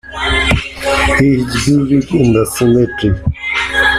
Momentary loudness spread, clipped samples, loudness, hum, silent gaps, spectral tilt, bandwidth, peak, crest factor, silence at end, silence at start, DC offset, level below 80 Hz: 5 LU; under 0.1%; -13 LUFS; none; none; -5 dB/octave; 15 kHz; 0 dBFS; 12 dB; 0 s; 0.05 s; under 0.1%; -26 dBFS